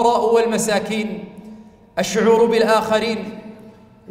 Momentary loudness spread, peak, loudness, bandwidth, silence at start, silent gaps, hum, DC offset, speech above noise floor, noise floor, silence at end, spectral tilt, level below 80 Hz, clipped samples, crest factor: 18 LU; -4 dBFS; -18 LUFS; 16 kHz; 0 s; none; none; under 0.1%; 27 dB; -44 dBFS; 0.4 s; -4 dB/octave; -54 dBFS; under 0.1%; 16 dB